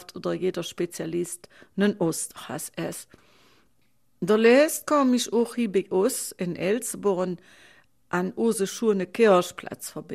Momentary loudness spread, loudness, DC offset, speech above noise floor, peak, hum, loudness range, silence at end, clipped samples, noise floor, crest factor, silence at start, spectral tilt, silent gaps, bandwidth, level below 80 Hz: 14 LU; -25 LUFS; under 0.1%; 45 dB; -8 dBFS; none; 7 LU; 0 s; under 0.1%; -70 dBFS; 18 dB; 0 s; -4.5 dB/octave; none; 15.5 kHz; -68 dBFS